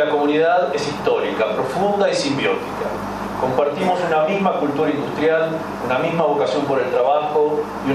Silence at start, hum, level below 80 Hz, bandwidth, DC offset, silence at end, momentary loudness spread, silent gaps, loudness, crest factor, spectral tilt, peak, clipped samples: 0 s; 50 Hz at -40 dBFS; -52 dBFS; 13.5 kHz; under 0.1%; 0 s; 6 LU; none; -19 LUFS; 16 dB; -5.5 dB/octave; -2 dBFS; under 0.1%